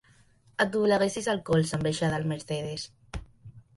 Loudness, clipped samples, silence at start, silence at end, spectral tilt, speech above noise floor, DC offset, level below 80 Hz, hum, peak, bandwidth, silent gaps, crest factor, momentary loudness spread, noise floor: -28 LUFS; under 0.1%; 0.6 s; 0.15 s; -5.5 dB/octave; 33 dB; under 0.1%; -52 dBFS; none; -10 dBFS; 11.5 kHz; none; 18 dB; 16 LU; -60 dBFS